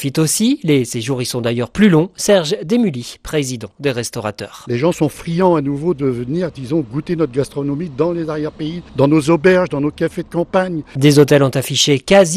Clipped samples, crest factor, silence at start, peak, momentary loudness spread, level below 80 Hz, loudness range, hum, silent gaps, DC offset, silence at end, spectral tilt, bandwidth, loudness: under 0.1%; 16 dB; 0 s; 0 dBFS; 10 LU; -46 dBFS; 5 LU; none; none; under 0.1%; 0 s; -5 dB/octave; 15 kHz; -16 LUFS